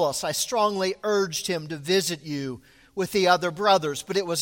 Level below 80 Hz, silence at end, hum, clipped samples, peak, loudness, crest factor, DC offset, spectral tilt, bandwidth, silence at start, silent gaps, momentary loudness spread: -62 dBFS; 0 s; none; under 0.1%; -6 dBFS; -24 LUFS; 18 dB; under 0.1%; -3.5 dB/octave; 17 kHz; 0 s; none; 11 LU